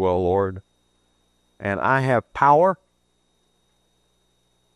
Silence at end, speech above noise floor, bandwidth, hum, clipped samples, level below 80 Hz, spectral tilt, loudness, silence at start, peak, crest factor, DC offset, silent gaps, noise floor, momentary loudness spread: 2 s; 48 dB; 12 kHz; 60 Hz at -55 dBFS; under 0.1%; -58 dBFS; -8 dB/octave; -20 LUFS; 0 s; -4 dBFS; 20 dB; under 0.1%; none; -68 dBFS; 15 LU